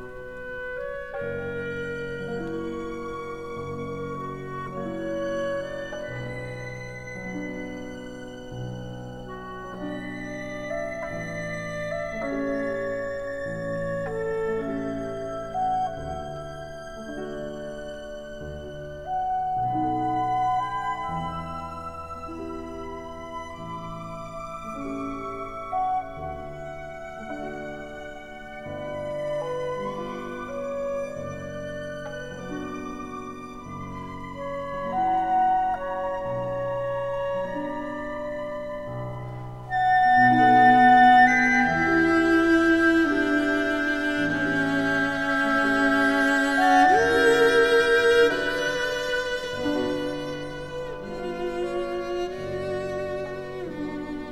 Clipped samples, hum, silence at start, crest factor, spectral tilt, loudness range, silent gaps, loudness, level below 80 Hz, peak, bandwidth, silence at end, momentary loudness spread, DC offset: under 0.1%; none; 0 s; 20 dB; -5.5 dB/octave; 16 LU; none; -25 LUFS; -48 dBFS; -6 dBFS; 14 kHz; 0 s; 18 LU; 0.3%